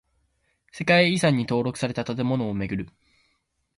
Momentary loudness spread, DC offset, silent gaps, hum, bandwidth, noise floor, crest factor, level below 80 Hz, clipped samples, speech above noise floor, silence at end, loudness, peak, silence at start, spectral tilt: 12 LU; under 0.1%; none; none; 11.5 kHz; -72 dBFS; 20 dB; -54 dBFS; under 0.1%; 49 dB; 0.9 s; -24 LUFS; -6 dBFS; 0.75 s; -5.5 dB/octave